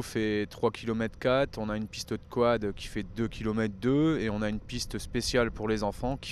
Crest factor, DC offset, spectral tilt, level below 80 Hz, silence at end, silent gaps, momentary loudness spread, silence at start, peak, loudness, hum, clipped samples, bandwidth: 18 dB; under 0.1%; -5.5 dB/octave; -46 dBFS; 0 s; none; 8 LU; 0 s; -12 dBFS; -30 LUFS; none; under 0.1%; 14.5 kHz